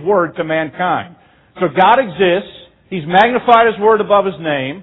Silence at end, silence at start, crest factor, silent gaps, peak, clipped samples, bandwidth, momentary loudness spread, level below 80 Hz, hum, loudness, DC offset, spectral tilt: 0 s; 0 s; 14 dB; none; 0 dBFS; under 0.1%; 6.4 kHz; 10 LU; -52 dBFS; none; -13 LUFS; under 0.1%; -7.5 dB/octave